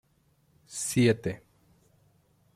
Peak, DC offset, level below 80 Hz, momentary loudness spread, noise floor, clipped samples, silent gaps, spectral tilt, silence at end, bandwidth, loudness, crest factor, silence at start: -10 dBFS; under 0.1%; -64 dBFS; 17 LU; -68 dBFS; under 0.1%; none; -5 dB/octave; 1.2 s; 15.5 kHz; -28 LUFS; 22 dB; 0.7 s